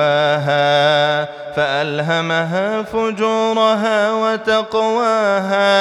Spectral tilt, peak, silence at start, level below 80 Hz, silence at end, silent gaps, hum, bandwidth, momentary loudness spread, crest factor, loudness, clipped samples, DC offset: -5 dB/octave; -2 dBFS; 0 s; -56 dBFS; 0 s; none; none; 11.5 kHz; 6 LU; 14 dB; -16 LUFS; under 0.1%; under 0.1%